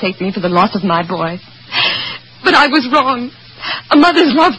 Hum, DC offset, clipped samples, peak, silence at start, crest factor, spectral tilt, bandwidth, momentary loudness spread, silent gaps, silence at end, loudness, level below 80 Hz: none; 0.3%; 0.1%; 0 dBFS; 0 s; 14 dB; -5.5 dB/octave; 9.8 kHz; 12 LU; none; 0 s; -13 LUFS; -50 dBFS